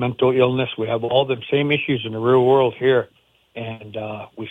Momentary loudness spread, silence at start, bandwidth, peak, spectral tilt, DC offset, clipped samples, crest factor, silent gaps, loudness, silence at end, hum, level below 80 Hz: 15 LU; 0 s; 3.9 kHz; -4 dBFS; -8.5 dB/octave; under 0.1%; under 0.1%; 16 dB; none; -19 LUFS; 0 s; none; -60 dBFS